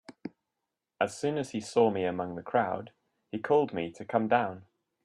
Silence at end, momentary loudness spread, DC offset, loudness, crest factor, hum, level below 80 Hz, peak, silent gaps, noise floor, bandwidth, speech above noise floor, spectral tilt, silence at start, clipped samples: 0.4 s; 15 LU; under 0.1%; -30 LUFS; 20 dB; none; -74 dBFS; -10 dBFS; none; -86 dBFS; 11.5 kHz; 57 dB; -6 dB/octave; 0.1 s; under 0.1%